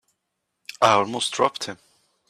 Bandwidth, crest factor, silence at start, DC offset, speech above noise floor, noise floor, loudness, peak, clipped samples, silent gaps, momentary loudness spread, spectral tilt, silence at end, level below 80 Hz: 15 kHz; 20 dB; 0.8 s; under 0.1%; 57 dB; -79 dBFS; -21 LUFS; -4 dBFS; under 0.1%; none; 20 LU; -3 dB/octave; 0.55 s; -68 dBFS